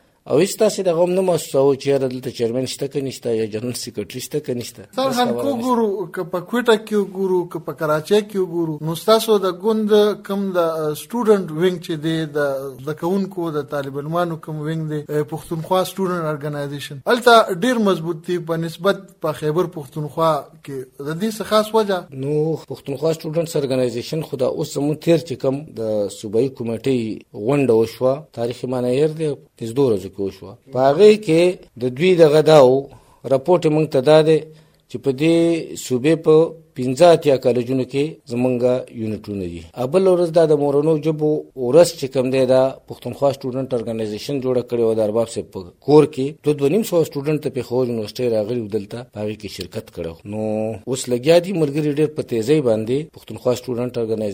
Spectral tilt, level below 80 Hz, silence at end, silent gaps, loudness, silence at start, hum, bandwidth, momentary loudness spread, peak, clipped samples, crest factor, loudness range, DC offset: -6 dB/octave; -58 dBFS; 0 s; none; -19 LUFS; 0.25 s; none; 16 kHz; 13 LU; 0 dBFS; under 0.1%; 18 dB; 7 LU; under 0.1%